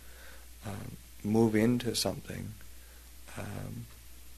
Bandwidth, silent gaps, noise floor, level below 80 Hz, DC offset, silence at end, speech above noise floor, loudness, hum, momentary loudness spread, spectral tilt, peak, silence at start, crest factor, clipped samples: 13.5 kHz; none; -51 dBFS; -54 dBFS; 0.2%; 0 s; 20 dB; -32 LUFS; none; 25 LU; -5 dB/octave; -14 dBFS; 0 s; 20 dB; under 0.1%